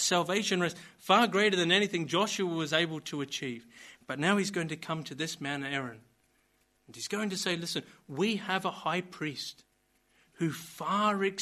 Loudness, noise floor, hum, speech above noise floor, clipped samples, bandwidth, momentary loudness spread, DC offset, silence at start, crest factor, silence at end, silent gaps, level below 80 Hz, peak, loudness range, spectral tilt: -31 LUFS; -71 dBFS; none; 40 dB; under 0.1%; 13 kHz; 14 LU; under 0.1%; 0 s; 22 dB; 0 s; none; -76 dBFS; -10 dBFS; 7 LU; -3.5 dB/octave